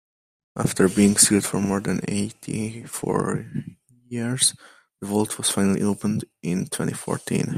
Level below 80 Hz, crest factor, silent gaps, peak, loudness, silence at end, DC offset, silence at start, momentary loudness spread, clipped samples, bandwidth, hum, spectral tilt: -58 dBFS; 24 dB; none; 0 dBFS; -22 LUFS; 0 s; under 0.1%; 0.55 s; 14 LU; under 0.1%; 15.5 kHz; none; -4 dB/octave